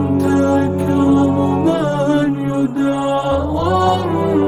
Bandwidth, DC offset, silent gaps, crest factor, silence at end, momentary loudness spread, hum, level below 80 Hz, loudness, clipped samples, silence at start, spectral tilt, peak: 12.5 kHz; under 0.1%; none; 12 dB; 0 s; 4 LU; none; -40 dBFS; -16 LUFS; under 0.1%; 0 s; -7.5 dB/octave; -2 dBFS